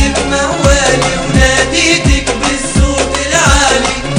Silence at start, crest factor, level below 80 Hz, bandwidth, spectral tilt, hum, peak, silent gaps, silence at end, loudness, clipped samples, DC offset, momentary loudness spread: 0 s; 10 dB; -18 dBFS; 15 kHz; -3.5 dB/octave; none; 0 dBFS; none; 0 s; -10 LUFS; 0.7%; under 0.1%; 4 LU